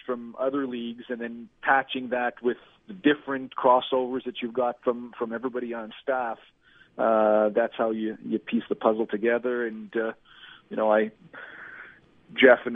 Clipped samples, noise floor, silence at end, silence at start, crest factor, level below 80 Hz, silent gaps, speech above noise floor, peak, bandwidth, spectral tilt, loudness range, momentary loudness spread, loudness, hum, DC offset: under 0.1%; -51 dBFS; 0 s; 0.1 s; 24 dB; -70 dBFS; none; 25 dB; -4 dBFS; 3.9 kHz; -8 dB/octave; 3 LU; 16 LU; -26 LUFS; none; under 0.1%